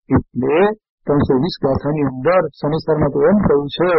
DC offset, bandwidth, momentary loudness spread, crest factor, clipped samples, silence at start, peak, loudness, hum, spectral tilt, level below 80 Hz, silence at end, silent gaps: under 0.1%; 6 kHz; 5 LU; 12 dB; under 0.1%; 0.1 s; -4 dBFS; -17 LUFS; none; -6.5 dB/octave; -38 dBFS; 0 s; 0.89-0.98 s